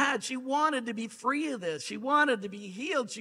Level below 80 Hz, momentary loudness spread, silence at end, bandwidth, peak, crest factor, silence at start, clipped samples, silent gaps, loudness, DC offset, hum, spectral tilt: -80 dBFS; 10 LU; 0 s; 14 kHz; -12 dBFS; 18 dB; 0 s; under 0.1%; none; -30 LUFS; under 0.1%; none; -3 dB/octave